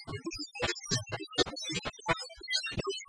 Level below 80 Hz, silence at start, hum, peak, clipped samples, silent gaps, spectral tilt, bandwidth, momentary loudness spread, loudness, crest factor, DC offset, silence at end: -56 dBFS; 0 s; none; -12 dBFS; under 0.1%; none; -3 dB/octave; 10.5 kHz; 5 LU; -34 LUFS; 24 dB; under 0.1%; 0 s